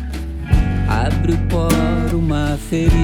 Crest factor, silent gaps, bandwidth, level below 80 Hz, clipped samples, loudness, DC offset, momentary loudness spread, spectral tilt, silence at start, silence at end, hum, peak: 14 dB; none; 18 kHz; -20 dBFS; under 0.1%; -18 LUFS; under 0.1%; 4 LU; -7 dB/octave; 0 s; 0 s; none; -2 dBFS